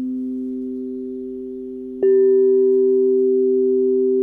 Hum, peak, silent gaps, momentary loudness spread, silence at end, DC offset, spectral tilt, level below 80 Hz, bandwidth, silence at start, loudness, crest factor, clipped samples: none; -8 dBFS; none; 16 LU; 0 s; under 0.1%; -10 dB/octave; -58 dBFS; 1.9 kHz; 0 s; -17 LUFS; 8 dB; under 0.1%